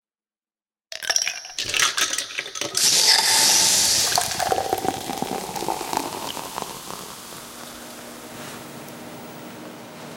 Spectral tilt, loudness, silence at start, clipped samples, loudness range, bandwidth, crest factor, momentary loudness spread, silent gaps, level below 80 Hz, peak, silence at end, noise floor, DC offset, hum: 0 dB/octave; -19 LUFS; 0.9 s; under 0.1%; 18 LU; 17 kHz; 22 dB; 23 LU; none; -58 dBFS; -4 dBFS; 0 s; under -90 dBFS; under 0.1%; none